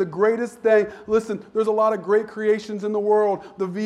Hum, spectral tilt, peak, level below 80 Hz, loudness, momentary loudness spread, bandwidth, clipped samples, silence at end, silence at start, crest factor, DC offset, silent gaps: none; -6.5 dB/octave; -6 dBFS; -62 dBFS; -22 LUFS; 6 LU; 11 kHz; under 0.1%; 0 s; 0 s; 14 dB; under 0.1%; none